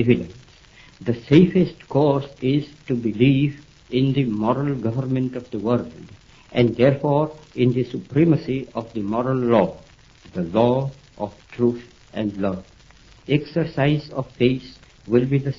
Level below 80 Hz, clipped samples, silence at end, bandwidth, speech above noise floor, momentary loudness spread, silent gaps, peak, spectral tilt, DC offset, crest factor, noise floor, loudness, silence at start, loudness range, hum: -50 dBFS; under 0.1%; 0.05 s; 7.4 kHz; 29 dB; 13 LU; none; -2 dBFS; -9 dB/octave; under 0.1%; 20 dB; -49 dBFS; -21 LUFS; 0 s; 5 LU; none